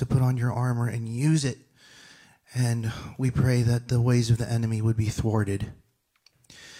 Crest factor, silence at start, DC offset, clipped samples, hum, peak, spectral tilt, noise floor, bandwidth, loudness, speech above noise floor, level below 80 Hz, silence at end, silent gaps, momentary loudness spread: 16 dB; 0 s; under 0.1%; under 0.1%; none; -10 dBFS; -6.5 dB/octave; -65 dBFS; 13.5 kHz; -26 LUFS; 41 dB; -48 dBFS; 0 s; none; 9 LU